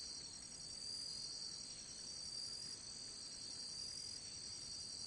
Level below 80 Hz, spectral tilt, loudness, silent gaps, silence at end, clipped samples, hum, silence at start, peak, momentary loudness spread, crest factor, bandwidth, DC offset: -74 dBFS; 0 dB/octave; -47 LUFS; none; 0 s; under 0.1%; none; 0 s; -38 dBFS; 4 LU; 14 dB; 11.5 kHz; under 0.1%